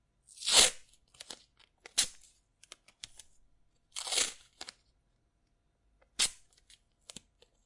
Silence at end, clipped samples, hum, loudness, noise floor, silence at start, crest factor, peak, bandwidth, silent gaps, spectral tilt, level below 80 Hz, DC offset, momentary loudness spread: 1.35 s; under 0.1%; none; -29 LUFS; -75 dBFS; 0.35 s; 28 dB; -8 dBFS; 11.5 kHz; none; 1.5 dB/octave; -64 dBFS; under 0.1%; 28 LU